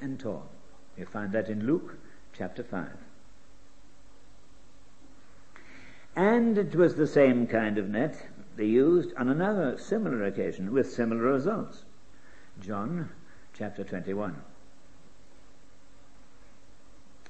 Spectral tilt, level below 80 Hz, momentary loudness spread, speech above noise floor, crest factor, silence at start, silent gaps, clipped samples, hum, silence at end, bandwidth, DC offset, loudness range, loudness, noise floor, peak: -8 dB/octave; -62 dBFS; 19 LU; 31 dB; 22 dB; 0 s; none; under 0.1%; none; 2.85 s; 8.6 kHz; 0.8%; 16 LU; -28 LUFS; -59 dBFS; -10 dBFS